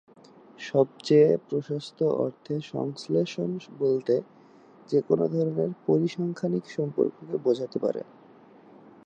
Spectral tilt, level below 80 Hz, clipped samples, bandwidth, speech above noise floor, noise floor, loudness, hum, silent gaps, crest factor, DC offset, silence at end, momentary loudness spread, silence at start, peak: -7.5 dB/octave; -76 dBFS; under 0.1%; 9 kHz; 27 dB; -53 dBFS; -27 LUFS; none; none; 18 dB; under 0.1%; 1 s; 10 LU; 0.6 s; -8 dBFS